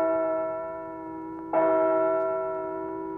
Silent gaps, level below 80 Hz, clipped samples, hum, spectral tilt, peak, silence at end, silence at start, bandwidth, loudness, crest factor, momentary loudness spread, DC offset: none; -64 dBFS; under 0.1%; none; -9.5 dB/octave; -14 dBFS; 0 s; 0 s; 3.3 kHz; -27 LUFS; 14 dB; 14 LU; under 0.1%